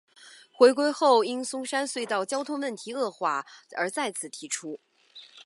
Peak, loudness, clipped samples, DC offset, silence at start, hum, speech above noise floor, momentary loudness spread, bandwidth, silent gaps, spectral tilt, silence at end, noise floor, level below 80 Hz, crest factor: -6 dBFS; -27 LUFS; under 0.1%; under 0.1%; 0.25 s; none; 26 dB; 14 LU; 11.5 kHz; none; -2.5 dB/octave; 0.05 s; -52 dBFS; -86 dBFS; 22 dB